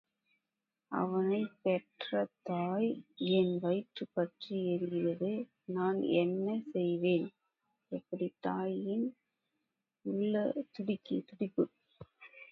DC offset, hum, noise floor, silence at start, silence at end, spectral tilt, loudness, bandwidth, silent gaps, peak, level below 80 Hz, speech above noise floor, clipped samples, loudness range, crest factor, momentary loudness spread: under 0.1%; none; -90 dBFS; 0.9 s; 0.05 s; -9.5 dB/octave; -35 LUFS; 5.4 kHz; none; -18 dBFS; -80 dBFS; 55 dB; under 0.1%; 4 LU; 18 dB; 9 LU